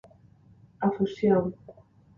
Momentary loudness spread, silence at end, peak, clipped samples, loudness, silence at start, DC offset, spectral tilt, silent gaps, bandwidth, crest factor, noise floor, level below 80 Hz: 12 LU; 0.45 s; -10 dBFS; under 0.1%; -27 LUFS; 0.8 s; under 0.1%; -9 dB/octave; none; 7 kHz; 18 dB; -56 dBFS; -62 dBFS